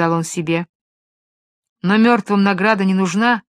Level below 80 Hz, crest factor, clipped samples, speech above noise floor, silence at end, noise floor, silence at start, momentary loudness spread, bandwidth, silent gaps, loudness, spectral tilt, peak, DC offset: -64 dBFS; 18 dB; under 0.1%; over 74 dB; 0.1 s; under -90 dBFS; 0 s; 8 LU; 13 kHz; 0.69-1.63 s, 1.69-1.76 s; -16 LUFS; -5.5 dB/octave; 0 dBFS; under 0.1%